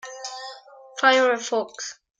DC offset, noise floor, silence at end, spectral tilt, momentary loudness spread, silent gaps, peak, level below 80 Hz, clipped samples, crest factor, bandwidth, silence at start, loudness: under 0.1%; -44 dBFS; 0.25 s; -0.5 dB/octave; 20 LU; none; -4 dBFS; -82 dBFS; under 0.1%; 20 dB; 9.4 kHz; 0.05 s; -21 LUFS